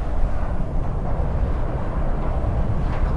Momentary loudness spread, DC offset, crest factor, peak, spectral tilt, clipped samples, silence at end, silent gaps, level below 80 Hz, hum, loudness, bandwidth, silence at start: 3 LU; under 0.1%; 14 dB; -8 dBFS; -9 dB/octave; under 0.1%; 0 s; none; -22 dBFS; none; -26 LUFS; 4.9 kHz; 0 s